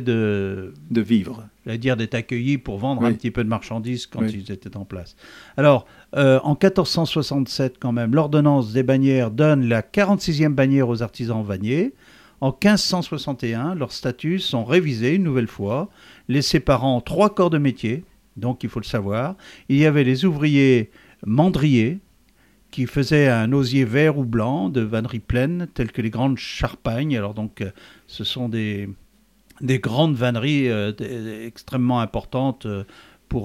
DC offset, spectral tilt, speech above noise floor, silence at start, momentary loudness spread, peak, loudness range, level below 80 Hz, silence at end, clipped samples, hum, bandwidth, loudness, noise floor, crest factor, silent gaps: under 0.1%; -6.5 dB/octave; 37 dB; 0 s; 13 LU; -2 dBFS; 6 LU; -44 dBFS; 0 s; under 0.1%; none; 15 kHz; -21 LUFS; -57 dBFS; 20 dB; none